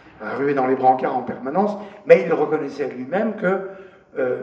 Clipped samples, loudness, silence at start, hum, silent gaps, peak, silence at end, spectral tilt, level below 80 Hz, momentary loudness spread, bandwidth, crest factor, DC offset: under 0.1%; -20 LUFS; 0.05 s; none; none; 0 dBFS; 0 s; -8 dB/octave; -68 dBFS; 13 LU; 7 kHz; 20 dB; under 0.1%